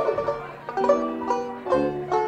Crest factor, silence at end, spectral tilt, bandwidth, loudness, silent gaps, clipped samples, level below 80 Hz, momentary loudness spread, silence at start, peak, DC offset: 16 dB; 0 s; -6.5 dB/octave; 9 kHz; -25 LUFS; none; under 0.1%; -54 dBFS; 8 LU; 0 s; -8 dBFS; under 0.1%